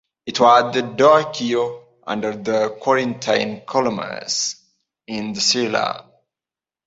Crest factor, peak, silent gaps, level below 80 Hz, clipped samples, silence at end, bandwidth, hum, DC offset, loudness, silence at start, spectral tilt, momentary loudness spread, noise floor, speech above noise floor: 18 dB; -2 dBFS; none; -62 dBFS; under 0.1%; 0.85 s; 8 kHz; none; under 0.1%; -19 LUFS; 0.25 s; -3 dB/octave; 14 LU; under -90 dBFS; over 71 dB